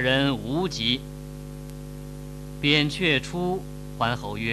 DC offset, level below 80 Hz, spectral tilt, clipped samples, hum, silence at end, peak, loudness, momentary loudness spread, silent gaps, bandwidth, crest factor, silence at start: under 0.1%; -44 dBFS; -5 dB/octave; under 0.1%; 50 Hz at -40 dBFS; 0 s; -4 dBFS; -24 LUFS; 18 LU; none; 13.5 kHz; 22 dB; 0 s